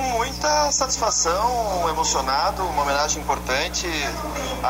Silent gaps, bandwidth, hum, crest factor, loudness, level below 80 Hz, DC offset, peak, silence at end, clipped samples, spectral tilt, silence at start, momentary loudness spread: none; 16 kHz; 60 Hz at -35 dBFS; 12 dB; -21 LUFS; -36 dBFS; under 0.1%; -10 dBFS; 0 s; under 0.1%; -2 dB/octave; 0 s; 5 LU